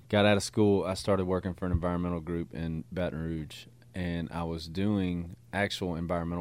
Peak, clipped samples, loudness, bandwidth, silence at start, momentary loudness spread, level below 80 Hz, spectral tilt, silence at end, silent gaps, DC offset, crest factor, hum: -10 dBFS; under 0.1%; -31 LUFS; 15.5 kHz; 0.1 s; 11 LU; -48 dBFS; -6 dB/octave; 0 s; none; under 0.1%; 20 dB; none